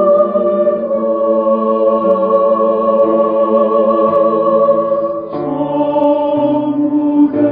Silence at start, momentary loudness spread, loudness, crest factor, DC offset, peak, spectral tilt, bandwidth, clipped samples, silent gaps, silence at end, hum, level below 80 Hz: 0 s; 4 LU; -13 LUFS; 10 dB; under 0.1%; -2 dBFS; -11 dB/octave; 4.2 kHz; under 0.1%; none; 0 s; none; -56 dBFS